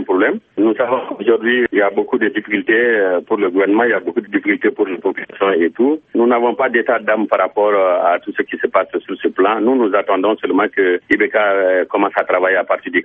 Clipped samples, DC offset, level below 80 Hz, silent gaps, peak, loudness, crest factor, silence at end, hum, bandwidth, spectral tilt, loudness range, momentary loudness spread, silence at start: under 0.1%; under 0.1%; -62 dBFS; none; 0 dBFS; -15 LUFS; 16 dB; 0 s; none; 3.8 kHz; -8 dB/octave; 1 LU; 5 LU; 0 s